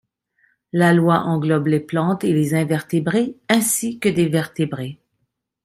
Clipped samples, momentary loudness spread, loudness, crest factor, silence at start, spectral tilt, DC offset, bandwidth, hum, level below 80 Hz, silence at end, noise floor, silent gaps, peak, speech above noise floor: under 0.1%; 8 LU; -19 LUFS; 18 dB; 0.75 s; -5.5 dB/octave; under 0.1%; 15.5 kHz; none; -58 dBFS; 0.7 s; -73 dBFS; none; -2 dBFS; 55 dB